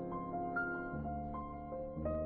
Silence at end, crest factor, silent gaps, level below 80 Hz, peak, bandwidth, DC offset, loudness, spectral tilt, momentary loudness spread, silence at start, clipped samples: 0 s; 14 dB; none; -52 dBFS; -26 dBFS; 4.5 kHz; under 0.1%; -41 LUFS; -8.5 dB/octave; 6 LU; 0 s; under 0.1%